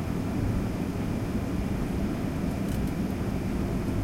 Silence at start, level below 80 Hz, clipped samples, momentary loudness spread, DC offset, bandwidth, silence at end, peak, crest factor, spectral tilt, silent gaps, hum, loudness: 0 s; -36 dBFS; under 0.1%; 1 LU; under 0.1%; 16 kHz; 0 s; -16 dBFS; 12 dB; -7.5 dB/octave; none; none; -30 LUFS